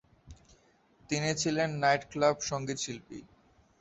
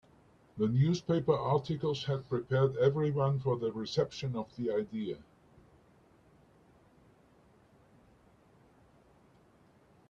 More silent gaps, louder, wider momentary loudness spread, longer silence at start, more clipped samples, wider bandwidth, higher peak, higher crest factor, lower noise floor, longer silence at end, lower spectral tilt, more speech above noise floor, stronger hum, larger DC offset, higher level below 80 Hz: neither; about the same, -30 LUFS vs -32 LUFS; first, 14 LU vs 9 LU; second, 0.25 s vs 0.55 s; neither; first, 8.2 kHz vs 7.4 kHz; first, -12 dBFS vs -16 dBFS; about the same, 20 dB vs 20 dB; about the same, -65 dBFS vs -64 dBFS; second, 0.55 s vs 4.9 s; second, -4 dB/octave vs -7.5 dB/octave; about the same, 34 dB vs 33 dB; neither; neither; about the same, -62 dBFS vs -66 dBFS